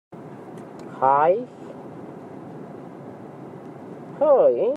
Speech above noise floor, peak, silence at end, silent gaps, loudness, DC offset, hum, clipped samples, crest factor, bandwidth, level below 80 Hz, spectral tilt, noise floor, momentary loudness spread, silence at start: 21 dB; -4 dBFS; 0 s; none; -19 LUFS; under 0.1%; none; under 0.1%; 20 dB; 4.9 kHz; -76 dBFS; -8.5 dB/octave; -39 dBFS; 22 LU; 0.15 s